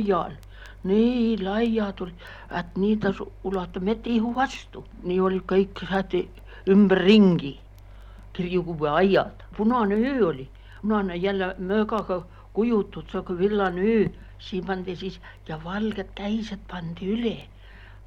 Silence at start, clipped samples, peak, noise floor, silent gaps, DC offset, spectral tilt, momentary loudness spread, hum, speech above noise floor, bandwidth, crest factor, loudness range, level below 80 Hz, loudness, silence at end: 0 s; under 0.1%; -6 dBFS; -45 dBFS; none; under 0.1%; -7.5 dB/octave; 16 LU; none; 21 dB; 7.6 kHz; 20 dB; 6 LU; -46 dBFS; -25 LUFS; 0 s